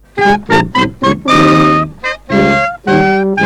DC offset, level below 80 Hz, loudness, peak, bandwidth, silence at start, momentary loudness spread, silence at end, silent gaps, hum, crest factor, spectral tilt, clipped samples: under 0.1%; -36 dBFS; -11 LUFS; -2 dBFS; 12.5 kHz; 0.15 s; 6 LU; 0 s; none; none; 8 dB; -6 dB/octave; under 0.1%